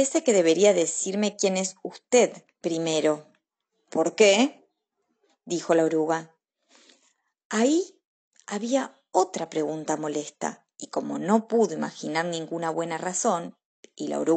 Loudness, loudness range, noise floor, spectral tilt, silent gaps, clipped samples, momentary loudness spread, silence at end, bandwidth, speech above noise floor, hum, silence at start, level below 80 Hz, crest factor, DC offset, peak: -25 LUFS; 5 LU; -77 dBFS; -3.5 dB/octave; 7.45-7.50 s, 8.05-8.31 s, 13.65-13.83 s; under 0.1%; 13 LU; 0 s; 9.4 kHz; 53 dB; none; 0 s; -82 dBFS; 20 dB; under 0.1%; -6 dBFS